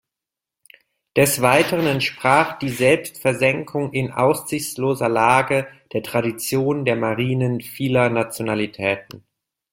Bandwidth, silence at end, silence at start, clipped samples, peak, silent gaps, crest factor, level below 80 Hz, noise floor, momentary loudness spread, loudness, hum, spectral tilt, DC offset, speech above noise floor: 16.5 kHz; 0.55 s; 1.15 s; under 0.1%; -2 dBFS; none; 20 dB; -56 dBFS; -87 dBFS; 8 LU; -20 LUFS; none; -5 dB/octave; under 0.1%; 67 dB